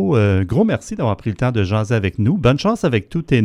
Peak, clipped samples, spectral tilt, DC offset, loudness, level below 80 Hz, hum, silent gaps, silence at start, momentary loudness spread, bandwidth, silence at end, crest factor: 0 dBFS; under 0.1%; -7.5 dB/octave; under 0.1%; -18 LUFS; -40 dBFS; none; none; 0 s; 5 LU; 11 kHz; 0 s; 16 dB